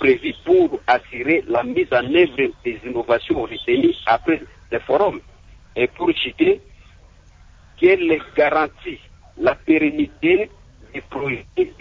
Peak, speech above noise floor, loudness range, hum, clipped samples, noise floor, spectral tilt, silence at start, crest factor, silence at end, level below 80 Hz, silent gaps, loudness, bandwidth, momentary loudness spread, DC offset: -4 dBFS; 29 dB; 3 LU; none; under 0.1%; -47 dBFS; -7 dB/octave; 0 s; 16 dB; 0.1 s; -48 dBFS; none; -19 LUFS; 7 kHz; 11 LU; under 0.1%